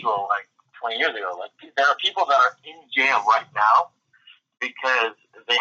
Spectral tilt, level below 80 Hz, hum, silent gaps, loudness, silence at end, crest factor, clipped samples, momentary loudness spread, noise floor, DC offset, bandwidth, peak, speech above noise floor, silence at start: -1 dB/octave; -86 dBFS; none; none; -21 LUFS; 0 s; 18 dB; under 0.1%; 13 LU; -54 dBFS; under 0.1%; 8 kHz; -6 dBFS; 33 dB; 0 s